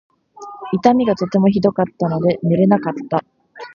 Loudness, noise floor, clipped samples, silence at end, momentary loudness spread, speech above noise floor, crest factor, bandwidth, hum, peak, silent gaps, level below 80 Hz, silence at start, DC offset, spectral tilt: -17 LUFS; -37 dBFS; under 0.1%; 0.1 s; 10 LU; 21 dB; 16 dB; 7 kHz; none; 0 dBFS; none; -54 dBFS; 0.4 s; under 0.1%; -8.5 dB/octave